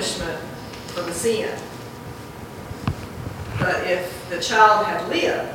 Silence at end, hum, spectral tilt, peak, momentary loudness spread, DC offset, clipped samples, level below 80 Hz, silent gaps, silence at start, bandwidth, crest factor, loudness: 0 s; none; -4 dB/octave; -2 dBFS; 20 LU; under 0.1%; under 0.1%; -46 dBFS; none; 0 s; 17 kHz; 22 dB; -22 LUFS